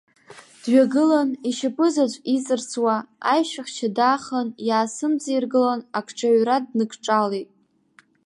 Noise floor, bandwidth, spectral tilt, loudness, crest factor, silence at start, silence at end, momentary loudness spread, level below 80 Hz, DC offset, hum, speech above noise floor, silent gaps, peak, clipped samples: -58 dBFS; 11.5 kHz; -4 dB/octave; -22 LUFS; 16 dB; 0.3 s; 0.85 s; 8 LU; -78 dBFS; under 0.1%; none; 37 dB; none; -6 dBFS; under 0.1%